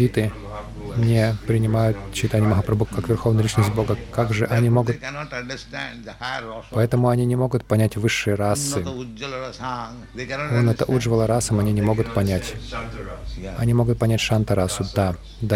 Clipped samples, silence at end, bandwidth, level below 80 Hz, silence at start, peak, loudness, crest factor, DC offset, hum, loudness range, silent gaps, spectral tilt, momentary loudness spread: under 0.1%; 0 s; 15.5 kHz; -40 dBFS; 0 s; -6 dBFS; -22 LUFS; 16 dB; under 0.1%; none; 3 LU; none; -6 dB/octave; 12 LU